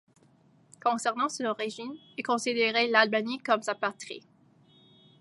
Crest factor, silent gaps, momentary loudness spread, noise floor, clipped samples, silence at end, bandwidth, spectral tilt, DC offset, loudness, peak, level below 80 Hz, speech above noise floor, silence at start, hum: 24 dB; none; 17 LU; -62 dBFS; under 0.1%; 1 s; 11.5 kHz; -2.5 dB/octave; under 0.1%; -28 LUFS; -8 dBFS; -84 dBFS; 33 dB; 0.85 s; none